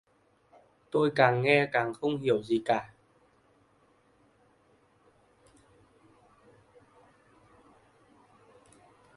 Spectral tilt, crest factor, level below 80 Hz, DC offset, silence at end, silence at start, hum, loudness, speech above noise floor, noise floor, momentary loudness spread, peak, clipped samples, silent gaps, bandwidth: -6.5 dB/octave; 28 dB; -72 dBFS; under 0.1%; 6.3 s; 0.95 s; none; -27 LUFS; 40 dB; -66 dBFS; 8 LU; -6 dBFS; under 0.1%; none; 11.5 kHz